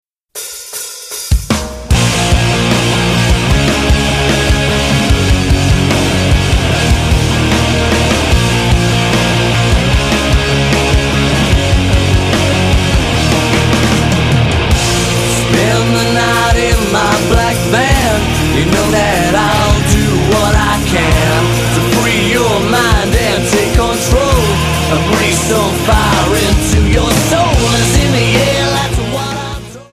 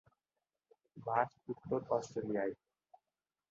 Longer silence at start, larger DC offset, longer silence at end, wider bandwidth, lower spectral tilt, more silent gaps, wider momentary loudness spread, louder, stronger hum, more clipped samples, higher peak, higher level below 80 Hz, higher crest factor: second, 0.35 s vs 0.95 s; neither; second, 0.1 s vs 0.95 s; first, 15.5 kHz vs 7.2 kHz; second, -4.5 dB/octave vs -6 dB/octave; neither; second, 2 LU vs 12 LU; first, -11 LUFS vs -39 LUFS; neither; neither; first, 0 dBFS vs -18 dBFS; first, -18 dBFS vs -76 dBFS; second, 10 dB vs 24 dB